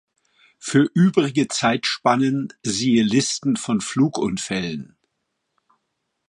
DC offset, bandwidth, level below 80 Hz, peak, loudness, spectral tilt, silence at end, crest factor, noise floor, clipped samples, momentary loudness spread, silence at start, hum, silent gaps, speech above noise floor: under 0.1%; 11.5 kHz; -58 dBFS; -4 dBFS; -20 LUFS; -4.5 dB/octave; 1.45 s; 18 dB; -76 dBFS; under 0.1%; 8 LU; 0.65 s; none; none; 56 dB